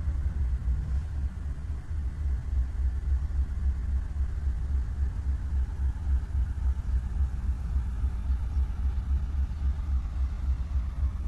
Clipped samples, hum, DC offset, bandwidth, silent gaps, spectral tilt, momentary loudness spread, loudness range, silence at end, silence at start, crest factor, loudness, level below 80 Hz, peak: under 0.1%; none; under 0.1%; 3.7 kHz; none; -8 dB/octave; 3 LU; 1 LU; 0 s; 0 s; 10 dB; -32 LUFS; -28 dBFS; -18 dBFS